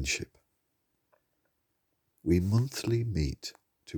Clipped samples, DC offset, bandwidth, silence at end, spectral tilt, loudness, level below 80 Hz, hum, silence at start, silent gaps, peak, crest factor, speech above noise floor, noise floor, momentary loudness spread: under 0.1%; under 0.1%; over 20 kHz; 0 s; -5.5 dB/octave; -30 LUFS; -48 dBFS; none; 0 s; none; -14 dBFS; 20 dB; 49 dB; -78 dBFS; 15 LU